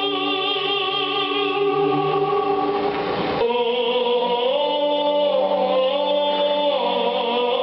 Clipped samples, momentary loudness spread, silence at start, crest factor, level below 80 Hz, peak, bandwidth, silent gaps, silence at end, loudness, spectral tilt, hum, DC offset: under 0.1%; 2 LU; 0 s; 10 dB; -60 dBFS; -10 dBFS; 5.8 kHz; none; 0 s; -20 LUFS; -1.5 dB/octave; none; under 0.1%